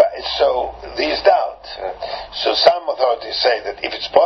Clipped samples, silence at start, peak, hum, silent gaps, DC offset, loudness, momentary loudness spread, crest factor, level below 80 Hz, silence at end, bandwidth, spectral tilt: under 0.1%; 0 s; 0 dBFS; none; none; under 0.1%; -18 LUFS; 12 LU; 18 dB; -46 dBFS; 0 s; 6.2 kHz; -3 dB/octave